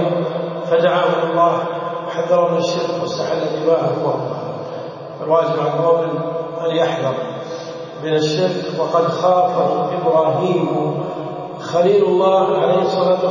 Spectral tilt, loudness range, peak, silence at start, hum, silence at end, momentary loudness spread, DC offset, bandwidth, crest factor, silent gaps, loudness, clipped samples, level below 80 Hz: -6.5 dB/octave; 3 LU; -2 dBFS; 0 s; none; 0 s; 12 LU; under 0.1%; 7.4 kHz; 14 dB; none; -18 LUFS; under 0.1%; -64 dBFS